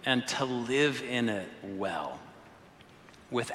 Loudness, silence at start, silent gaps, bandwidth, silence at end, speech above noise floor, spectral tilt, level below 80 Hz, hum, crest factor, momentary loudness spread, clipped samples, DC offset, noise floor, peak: -31 LUFS; 0 s; none; 14.5 kHz; 0 s; 24 dB; -4 dB/octave; -70 dBFS; none; 20 dB; 13 LU; under 0.1%; under 0.1%; -55 dBFS; -12 dBFS